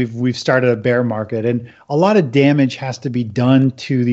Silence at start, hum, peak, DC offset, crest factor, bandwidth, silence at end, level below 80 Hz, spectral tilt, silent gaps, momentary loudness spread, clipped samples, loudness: 0 s; none; -2 dBFS; under 0.1%; 14 dB; 8 kHz; 0 s; -60 dBFS; -7 dB/octave; none; 9 LU; under 0.1%; -16 LUFS